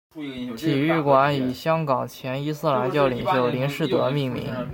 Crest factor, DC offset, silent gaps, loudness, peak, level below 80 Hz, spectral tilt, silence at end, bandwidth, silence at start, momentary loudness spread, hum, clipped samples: 18 dB; under 0.1%; none; -23 LUFS; -4 dBFS; -56 dBFS; -7 dB/octave; 0 s; 17 kHz; 0.15 s; 10 LU; none; under 0.1%